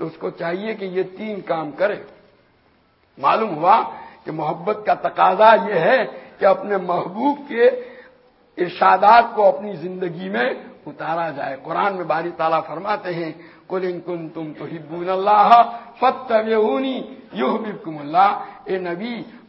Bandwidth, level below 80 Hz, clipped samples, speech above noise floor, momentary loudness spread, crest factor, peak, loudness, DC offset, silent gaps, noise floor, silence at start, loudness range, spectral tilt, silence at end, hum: 5.8 kHz; -66 dBFS; under 0.1%; 39 dB; 17 LU; 20 dB; 0 dBFS; -19 LUFS; under 0.1%; none; -58 dBFS; 0 s; 6 LU; -8 dB/octave; 0.1 s; none